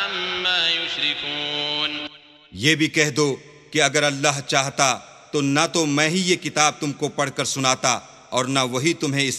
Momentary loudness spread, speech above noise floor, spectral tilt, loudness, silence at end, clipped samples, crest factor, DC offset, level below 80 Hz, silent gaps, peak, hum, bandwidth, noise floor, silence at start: 8 LU; 22 dB; -3 dB/octave; -21 LUFS; 0 s; under 0.1%; 22 dB; under 0.1%; -64 dBFS; none; 0 dBFS; none; 14.5 kHz; -43 dBFS; 0 s